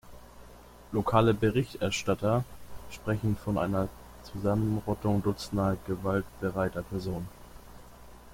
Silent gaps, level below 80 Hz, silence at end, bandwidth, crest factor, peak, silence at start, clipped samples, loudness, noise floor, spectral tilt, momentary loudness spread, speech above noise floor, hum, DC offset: none; -50 dBFS; 0 s; 16.5 kHz; 22 dB; -8 dBFS; 0.05 s; under 0.1%; -30 LUFS; -51 dBFS; -6.5 dB/octave; 13 LU; 22 dB; 60 Hz at -50 dBFS; under 0.1%